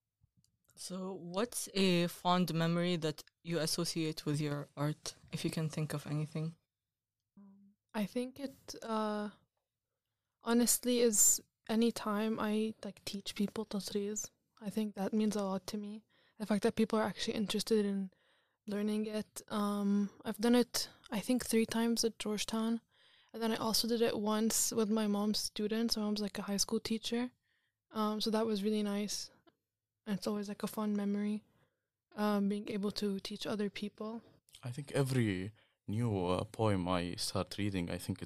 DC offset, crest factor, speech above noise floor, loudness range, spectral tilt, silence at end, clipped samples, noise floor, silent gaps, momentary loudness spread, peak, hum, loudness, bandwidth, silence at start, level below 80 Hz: under 0.1%; 20 dB; over 55 dB; 8 LU; -4 dB/octave; 0 s; under 0.1%; under -90 dBFS; none; 13 LU; -16 dBFS; none; -35 LUFS; 15.5 kHz; 0.8 s; -66 dBFS